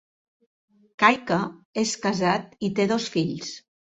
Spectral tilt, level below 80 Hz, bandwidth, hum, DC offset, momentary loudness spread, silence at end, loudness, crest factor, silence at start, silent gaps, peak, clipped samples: -4.5 dB/octave; -64 dBFS; 8.4 kHz; none; under 0.1%; 12 LU; 0.35 s; -24 LUFS; 24 dB; 1 s; 1.65-1.73 s; -2 dBFS; under 0.1%